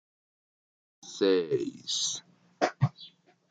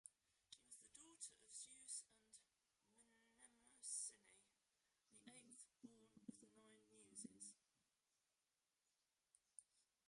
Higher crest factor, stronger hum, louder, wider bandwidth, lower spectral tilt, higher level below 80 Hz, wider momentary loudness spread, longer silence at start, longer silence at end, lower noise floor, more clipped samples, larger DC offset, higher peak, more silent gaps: about the same, 22 dB vs 26 dB; neither; first, -30 LUFS vs -58 LUFS; second, 9.6 kHz vs 11.5 kHz; first, -4 dB/octave vs -1 dB/octave; first, -70 dBFS vs under -90 dBFS; first, 22 LU vs 17 LU; first, 1.05 s vs 0.05 s; first, 0.45 s vs 0.25 s; second, -54 dBFS vs under -90 dBFS; neither; neither; first, -10 dBFS vs -38 dBFS; neither